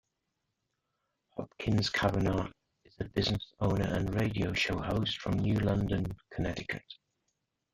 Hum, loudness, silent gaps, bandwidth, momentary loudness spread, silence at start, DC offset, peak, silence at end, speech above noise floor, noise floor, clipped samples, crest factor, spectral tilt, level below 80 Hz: none; -32 LUFS; none; 14.5 kHz; 13 LU; 1.35 s; under 0.1%; -12 dBFS; 0.8 s; 52 dB; -84 dBFS; under 0.1%; 22 dB; -6 dB/octave; -50 dBFS